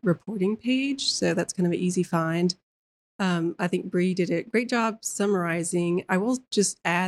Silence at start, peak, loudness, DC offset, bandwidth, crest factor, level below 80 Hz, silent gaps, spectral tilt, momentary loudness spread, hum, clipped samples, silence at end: 0.05 s; -8 dBFS; -26 LUFS; under 0.1%; 12.5 kHz; 18 dB; -70 dBFS; 2.63-3.19 s; -4.5 dB/octave; 3 LU; none; under 0.1%; 0 s